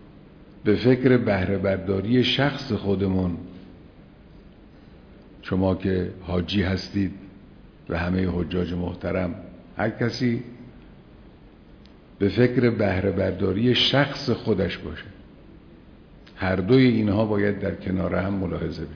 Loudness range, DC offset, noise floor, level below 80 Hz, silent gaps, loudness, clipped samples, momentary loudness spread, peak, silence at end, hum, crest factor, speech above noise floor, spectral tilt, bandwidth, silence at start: 7 LU; under 0.1%; -48 dBFS; -48 dBFS; none; -23 LUFS; under 0.1%; 12 LU; -4 dBFS; 0 s; none; 20 dB; 26 dB; -7.5 dB/octave; 5.4 kHz; 0 s